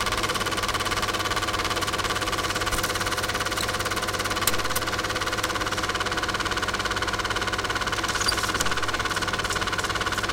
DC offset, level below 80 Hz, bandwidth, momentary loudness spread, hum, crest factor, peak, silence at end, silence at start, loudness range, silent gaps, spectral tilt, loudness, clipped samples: under 0.1%; -40 dBFS; 17 kHz; 2 LU; none; 24 dB; -2 dBFS; 0 s; 0 s; 1 LU; none; -2 dB/octave; -25 LUFS; under 0.1%